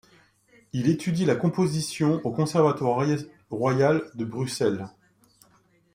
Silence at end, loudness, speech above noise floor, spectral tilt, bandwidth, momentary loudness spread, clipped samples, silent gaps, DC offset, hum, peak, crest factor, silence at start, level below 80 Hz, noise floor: 1.05 s; -25 LUFS; 38 dB; -6.5 dB/octave; 16 kHz; 10 LU; under 0.1%; none; under 0.1%; none; -8 dBFS; 18 dB; 0.75 s; -64 dBFS; -62 dBFS